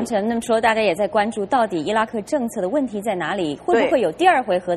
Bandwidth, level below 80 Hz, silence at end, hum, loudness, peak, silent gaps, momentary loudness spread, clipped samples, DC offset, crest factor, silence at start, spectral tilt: 13 kHz; -56 dBFS; 0 s; none; -20 LUFS; -2 dBFS; none; 7 LU; under 0.1%; under 0.1%; 16 dB; 0 s; -5 dB/octave